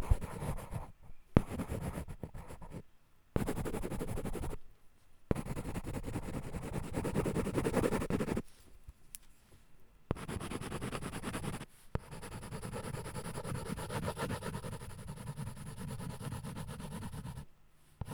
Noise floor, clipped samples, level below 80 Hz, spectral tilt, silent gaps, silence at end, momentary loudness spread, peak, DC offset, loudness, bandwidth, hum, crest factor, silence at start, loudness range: -62 dBFS; under 0.1%; -46 dBFS; -6 dB/octave; none; 0 s; 15 LU; -8 dBFS; under 0.1%; -40 LUFS; over 20 kHz; none; 32 dB; 0 s; 6 LU